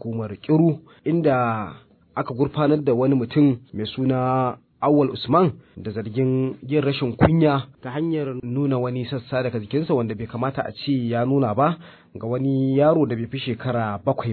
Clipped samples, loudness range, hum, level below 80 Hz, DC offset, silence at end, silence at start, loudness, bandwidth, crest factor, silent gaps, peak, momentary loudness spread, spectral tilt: under 0.1%; 3 LU; none; -52 dBFS; under 0.1%; 0 s; 0.05 s; -22 LUFS; 4.5 kHz; 20 dB; none; -2 dBFS; 10 LU; -11.5 dB/octave